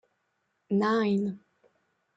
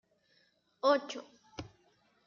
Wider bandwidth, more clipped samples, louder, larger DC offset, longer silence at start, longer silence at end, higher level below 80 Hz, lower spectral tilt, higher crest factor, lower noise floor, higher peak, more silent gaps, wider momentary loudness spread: about the same, 7.8 kHz vs 7.2 kHz; neither; first, -28 LUFS vs -33 LUFS; neither; second, 0.7 s vs 0.85 s; first, 0.8 s vs 0.6 s; about the same, -76 dBFS vs -72 dBFS; first, -7.5 dB/octave vs -2 dB/octave; second, 16 dB vs 22 dB; first, -77 dBFS vs -72 dBFS; about the same, -16 dBFS vs -16 dBFS; neither; second, 11 LU vs 20 LU